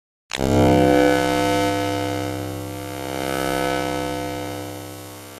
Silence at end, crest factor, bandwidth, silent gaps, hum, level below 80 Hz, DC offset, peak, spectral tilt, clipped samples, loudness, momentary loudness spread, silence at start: 0 s; 18 dB; 15.5 kHz; none; none; -42 dBFS; under 0.1%; -2 dBFS; -5.5 dB/octave; under 0.1%; -21 LUFS; 15 LU; 0.35 s